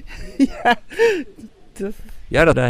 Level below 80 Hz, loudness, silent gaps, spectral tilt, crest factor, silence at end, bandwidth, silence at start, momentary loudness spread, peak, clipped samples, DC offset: -36 dBFS; -19 LUFS; none; -6 dB/octave; 18 dB; 0 s; 15.5 kHz; 0 s; 15 LU; -2 dBFS; under 0.1%; under 0.1%